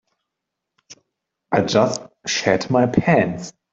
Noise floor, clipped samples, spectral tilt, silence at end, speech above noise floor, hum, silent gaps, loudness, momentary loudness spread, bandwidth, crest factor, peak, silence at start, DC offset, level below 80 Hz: -81 dBFS; under 0.1%; -5 dB/octave; 0.25 s; 63 dB; none; none; -19 LUFS; 8 LU; 8 kHz; 18 dB; -2 dBFS; 0.9 s; under 0.1%; -56 dBFS